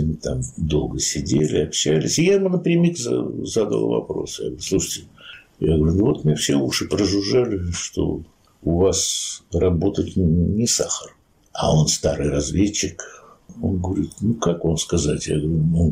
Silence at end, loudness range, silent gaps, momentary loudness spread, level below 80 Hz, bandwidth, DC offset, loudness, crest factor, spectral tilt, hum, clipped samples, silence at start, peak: 0 s; 3 LU; none; 9 LU; -38 dBFS; 16 kHz; under 0.1%; -21 LUFS; 12 dB; -5 dB/octave; none; under 0.1%; 0 s; -8 dBFS